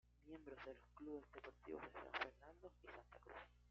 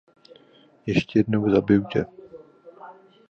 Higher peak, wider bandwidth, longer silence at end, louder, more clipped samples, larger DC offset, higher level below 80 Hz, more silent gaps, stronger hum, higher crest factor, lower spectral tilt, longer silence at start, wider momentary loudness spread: second, -32 dBFS vs -6 dBFS; about the same, 7.2 kHz vs 7.4 kHz; second, 0 s vs 0.4 s; second, -56 LUFS vs -22 LUFS; neither; neither; second, -72 dBFS vs -52 dBFS; neither; first, 60 Hz at -70 dBFS vs none; about the same, 24 dB vs 20 dB; second, -2 dB/octave vs -8 dB/octave; second, 0.05 s vs 0.85 s; second, 13 LU vs 19 LU